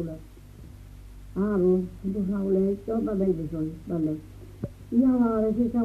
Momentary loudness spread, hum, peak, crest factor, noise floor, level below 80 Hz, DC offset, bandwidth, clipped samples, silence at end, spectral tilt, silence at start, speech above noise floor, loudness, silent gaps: 17 LU; none; -12 dBFS; 16 dB; -45 dBFS; -46 dBFS; under 0.1%; 13.5 kHz; under 0.1%; 0 s; -10 dB/octave; 0 s; 20 dB; -26 LUFS; none